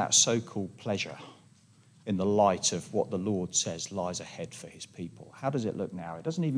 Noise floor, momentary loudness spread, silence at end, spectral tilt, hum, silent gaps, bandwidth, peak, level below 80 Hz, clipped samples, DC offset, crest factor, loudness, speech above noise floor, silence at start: -60 dBFS; 18 LU; 0 s; -3.5 dB/octave; none; none; 10.5 kHz; -10 dBFS; -70 dBFS; under 0.1%; under 0.1%; 20 dB; -30 LUFS; 29 dB; 0 s